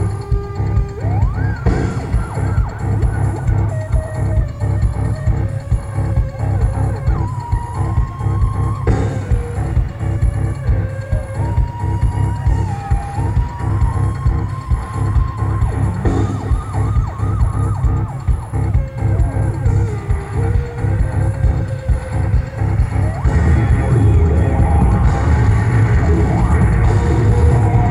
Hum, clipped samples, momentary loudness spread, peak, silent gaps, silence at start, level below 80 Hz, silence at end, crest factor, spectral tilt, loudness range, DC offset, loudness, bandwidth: none; under 0.1%; 6 LU; -2 dBFS; none; 0 s; -20 dBFS; 0 s; 14 dB; -8.5 dB/octave; 5 LU; under 0.1%; -17 LUFS; 11 kHz